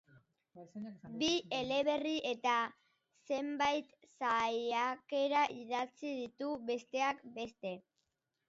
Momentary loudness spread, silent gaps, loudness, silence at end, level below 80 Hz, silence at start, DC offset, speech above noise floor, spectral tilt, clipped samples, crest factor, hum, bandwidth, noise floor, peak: 12 LU; none; -36 LUFS; 0.7 s; -76 dBFS; 0.15 s; under 0.1%; 48 dB; -1 dB/octave; under 0.1%; 18 dB; none; 7.6 kHz; -85 dBFS; -20 dBFS